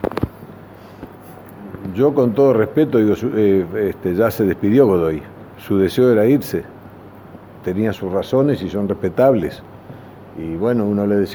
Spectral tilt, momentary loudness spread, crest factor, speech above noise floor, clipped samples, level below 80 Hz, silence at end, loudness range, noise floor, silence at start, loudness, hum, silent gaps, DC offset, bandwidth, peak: -8 dB/octave; 23 LU; 16 dB; 23 dB; under 0.1%; -46 dBFS; 0 s; 4 LU; -39 dBFS; 0 s; -17 LUFS; none; none; under 0.1%; over 20 kHz; 0 dBFS